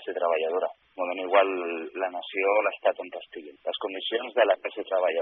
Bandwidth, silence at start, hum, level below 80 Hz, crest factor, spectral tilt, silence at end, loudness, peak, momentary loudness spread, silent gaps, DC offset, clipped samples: 4 kHz; 0 s; none; -82 dBFS; 20 dB; 1.5 dB/octave; 0 s; -27 LUFS; -8 dBFS; 11 LU; none; under 0.1%; under 0.1%